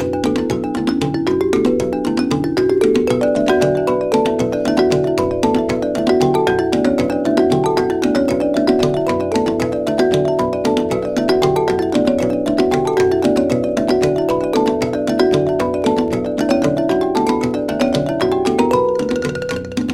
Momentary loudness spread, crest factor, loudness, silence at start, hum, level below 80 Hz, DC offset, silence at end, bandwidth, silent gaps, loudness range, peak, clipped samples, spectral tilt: 4 LU; 14 dB; -16 LUFS; 0 s; none; -44 dBFS; under 0.1%; 0 s; 15 kHz; none; 1 LU; -2 dBFS; under 0.1%; -6 dB/octave